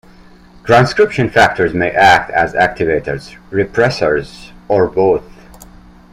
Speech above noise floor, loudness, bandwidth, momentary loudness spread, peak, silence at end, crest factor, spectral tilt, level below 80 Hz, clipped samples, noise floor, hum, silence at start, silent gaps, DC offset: 28 dB; -13 LUFS; 15 kHz; 11 LU; 0 dBFS; 0.9 s; 14 dB; -5.5 dB/octave; -40 dBFS; under 0.1%; -41 dBFS; none; 0.65 s; none; under 0.1%